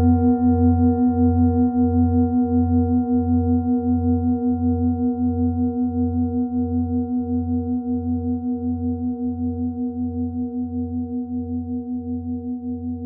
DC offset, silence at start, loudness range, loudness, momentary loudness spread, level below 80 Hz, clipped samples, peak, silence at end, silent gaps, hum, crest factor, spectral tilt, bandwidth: under 0.1%; 0 s; 8 LU; -21 LUFS; 9 LU; -44 dBFS; under 0.1%; -6 dBFS; 0 s; none; none; 14 dB; -17.5 dB/octave; 1.5 kHz